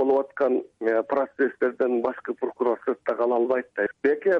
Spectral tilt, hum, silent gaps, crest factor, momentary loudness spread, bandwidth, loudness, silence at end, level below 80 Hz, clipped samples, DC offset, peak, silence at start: -7.5 dB/octave; none; none; 14 dB; 4 LU; 5.2 kHz; -25 LUFS; 0 s; -72 dBFS; under 0.1%; under 0.1%; -10 dBFS; 0 s